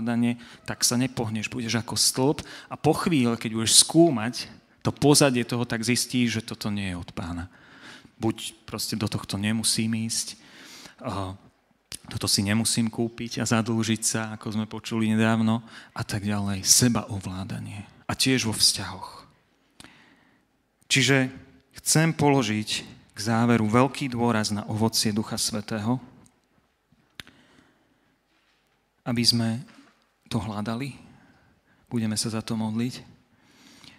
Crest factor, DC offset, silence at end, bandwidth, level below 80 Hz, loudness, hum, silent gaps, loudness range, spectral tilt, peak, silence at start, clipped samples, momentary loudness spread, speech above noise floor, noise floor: 26 dB; under 0.1%; 0.95 s; 16 kHz; -58 dBFS; -24 LUFS; none; none; 9 LU; -3.5 dB/octave; 0 dBFS; 0 s; under 0.1%; 17 LU; 44 dB; -68 dBFS